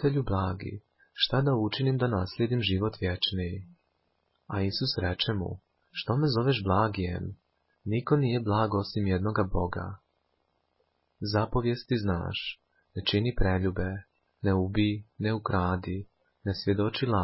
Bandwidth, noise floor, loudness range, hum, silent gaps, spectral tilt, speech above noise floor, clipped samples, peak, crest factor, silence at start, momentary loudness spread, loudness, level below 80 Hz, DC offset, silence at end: 5.8 kHz; -75 dBFS; 3 LU; none; none; -10 dB/octave; 47 dB; under 0.1%; -10 dBFS; 18 dB; 0 s; 12 LU; -29 LUFS; -44 dBFS; under 0.1%; 0 s